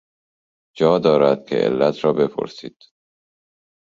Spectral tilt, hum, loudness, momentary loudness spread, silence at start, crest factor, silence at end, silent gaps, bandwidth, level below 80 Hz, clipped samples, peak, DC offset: -7 dB/octave; none; -18 LUFS; 15 LU; 0.75 s; 18 dB; 1.2 s; none; 7.4 kHz; -60 dBFS; under 0.1%; -2 dBFS; under 0.1%